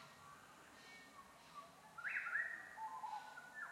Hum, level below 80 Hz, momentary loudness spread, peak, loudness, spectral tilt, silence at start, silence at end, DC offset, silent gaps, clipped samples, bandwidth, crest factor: none; -88 dBFS; 18 LU; -30 dBFS; -47 LUFS; -2 dB/octave; 0 s; 0 s; under 0.1%; none; under 0.1%; 16 kHz; 20 dB